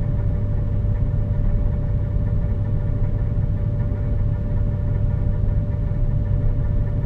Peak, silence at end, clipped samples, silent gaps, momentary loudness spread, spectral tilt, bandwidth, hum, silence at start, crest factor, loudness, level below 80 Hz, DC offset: -8 dBFS; 0 s; under 0.1%; none; 1 LU; -11.5 dB/octave; 3.2 kHz; none; 0 s; 12 dB; -23 LUFS; -22 dBFS; under 0.1%